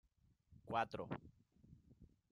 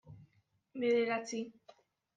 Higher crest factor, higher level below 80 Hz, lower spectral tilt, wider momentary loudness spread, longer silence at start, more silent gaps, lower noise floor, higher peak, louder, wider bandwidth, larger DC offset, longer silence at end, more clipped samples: first, 24 dB vs 16 dB; first, -74 dBFS vs -80 dBFS; first, -6.5 dB/octave vs -4.5 dB/octave; first, 25 LU vs 17 LU; first, 0.5 s vs 0.05 s; neither; about the same, -75 dBFS vs -74 dBFS; second, -26 dBFS vs -22 dBFS; second, -45 LUFS vs -35 LUFS; first, 11.5 kHz vs 9.2 kHz; neither; second, 0.25 s vs 0.65 s; neither